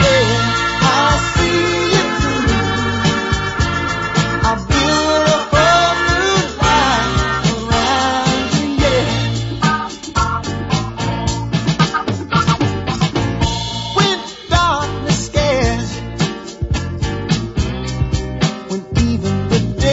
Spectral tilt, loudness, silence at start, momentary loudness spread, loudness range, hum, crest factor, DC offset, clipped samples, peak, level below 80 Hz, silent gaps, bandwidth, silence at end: -4.5 dB/octave; -16 LUFS; 0 s; 8 LU; 5 LU; none; 14 dB; under 0.1%; under 0.1%; 0 dBFS; -28 dBFS; none; 8 kHz; 0 s